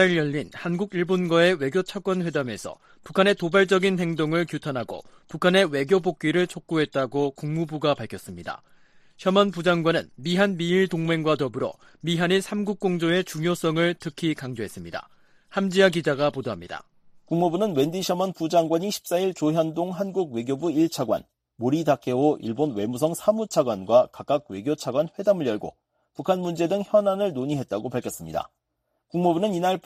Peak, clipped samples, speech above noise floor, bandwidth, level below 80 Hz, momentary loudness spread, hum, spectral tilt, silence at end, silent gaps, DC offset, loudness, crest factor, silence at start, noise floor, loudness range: -4 dBFS; under 0.1%; 53 dB; 15 kHz; -62 dBFS; 12 LU; none; -5.5 dB/octave; 0.05 s; none; under 0.1%; -24 LUFS; 20 dB; 0 s; -77 dBFS; 3 LU